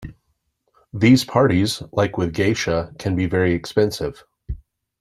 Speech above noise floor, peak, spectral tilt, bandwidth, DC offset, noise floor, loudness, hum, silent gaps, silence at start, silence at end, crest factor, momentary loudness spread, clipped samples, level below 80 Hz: 51 dB; -2 dBFS; -6 dB/octave; 14 kHz; under 0.1%; -70 dBFS; -19 LUFS; none; none; 0 s; 0.45 s; 18 dB; 20 LU; under 0.1%; -42 dBFS